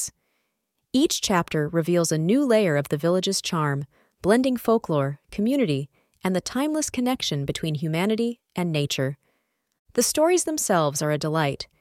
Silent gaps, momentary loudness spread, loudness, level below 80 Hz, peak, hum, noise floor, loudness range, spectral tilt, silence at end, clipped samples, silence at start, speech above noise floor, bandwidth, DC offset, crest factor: 9.79-9.85 s; 9 LU; -24 LUFS; -56 dBFS; -6 dBFS; none; -77 dBFS; 3 LU; -4.5 dB/octave; 0.15 s; under 0.1%; 0 s; 54 dB; 17 kHz; under 0.1%; 18 dB